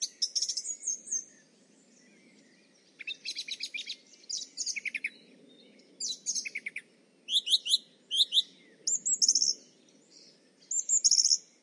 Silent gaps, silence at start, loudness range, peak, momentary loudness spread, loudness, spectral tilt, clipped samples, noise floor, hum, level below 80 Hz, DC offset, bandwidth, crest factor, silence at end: none; 0 s; 11 LU; -10 dBFS; 16 LU; -28 LUFS; 4 dB/octave; under 0.1%; -63 dBFS; none; under -90 dBFS; under 0.1%; 11.5 kHz; 22 dB; 0.2 s